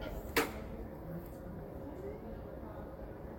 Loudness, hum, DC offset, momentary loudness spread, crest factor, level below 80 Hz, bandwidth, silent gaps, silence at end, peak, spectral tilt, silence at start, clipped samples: -42 LUFS; none; under 0.1%; 12 LU; 26 dB; -50 dBFS; 17 kHz; none; 0 s; -18 dBFS; -5 dB/octave; 0 s; under 0.1%